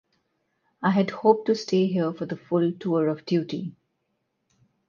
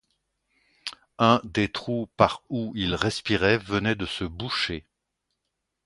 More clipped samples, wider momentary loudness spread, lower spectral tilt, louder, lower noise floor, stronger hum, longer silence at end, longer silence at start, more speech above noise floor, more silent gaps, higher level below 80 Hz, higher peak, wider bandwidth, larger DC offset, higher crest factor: neither; second, 11 LU vs 15 LU; first, -7 dB/octave vs -5.5 dB/octave; about the same, -25 LUFS vs -25 LUFS; second, -76 dBFS vs -81 dBFS; neither; first, 1.2 s vs 1.05 s; about the same, 0.8 s vs 0.85 s; second, 52 dB vs 56 dB; neither; second, -72 dBFS vs -50 dBFS; second, -6 dBFS vs -2 dBFS; second, 7.2 kHz vs 11.5 kHz; neither; about the same, 20 dB vs 24 dB